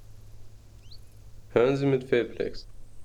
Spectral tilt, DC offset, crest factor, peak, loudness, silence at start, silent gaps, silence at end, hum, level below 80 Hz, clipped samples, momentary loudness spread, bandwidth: -7.5 dB/octave; under 0.1%; 20 dB; -10 dBFS; -26 LUFS; 0 s; none; 0 s; none; -50 dBFS; under 0.1%; 11 LU; 12 kHz